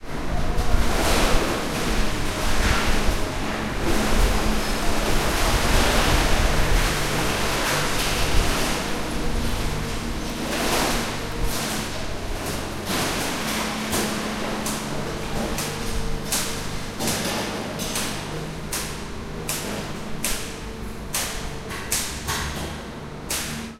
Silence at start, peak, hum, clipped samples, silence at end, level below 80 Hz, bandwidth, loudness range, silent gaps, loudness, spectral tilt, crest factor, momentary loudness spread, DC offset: 0 s; -4 dBFS; none; under 0.1%; 0 s; -28 dBFS; 16 kHz; 6 LU; none; -25 LUFS; -3.5 dB/octave; 18 dB; 9 LU; under 0.1%